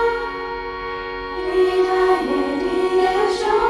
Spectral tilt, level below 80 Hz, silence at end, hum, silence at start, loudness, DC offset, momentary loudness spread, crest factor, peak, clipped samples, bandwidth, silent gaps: -4.5 dB/octave; -44 dBFS; 0 s; none; 0 s; -20 LUFS; under 0.1%; 10 LU; 14 dB; -6 dBFS; under 0.1%; 11.5 kHz; none